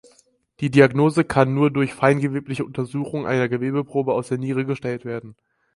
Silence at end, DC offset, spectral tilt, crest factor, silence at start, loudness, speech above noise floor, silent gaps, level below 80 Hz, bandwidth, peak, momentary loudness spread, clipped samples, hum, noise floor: 0.45 s; under 0.1%; -7.5 dB/octave; 20 dB; 0.6 s; -21 LUFS; 39 dB; none; -56 dBFS; 11.5 kHz; 0 dBFS; 12 LU; under 0.1%; none; -59 dBFS